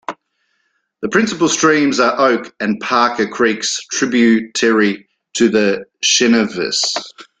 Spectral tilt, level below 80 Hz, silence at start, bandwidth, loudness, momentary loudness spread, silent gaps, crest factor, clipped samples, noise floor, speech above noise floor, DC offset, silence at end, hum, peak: -3 dB/octave; -56 dBFS; 0.1 s; 9.4 kHz; -15 LUFS; 8 LU; none; 14 dB; under 0.1%; -66 dBFS; 51 dB; under 0.1%; 0.15 s; none; 0 dBFS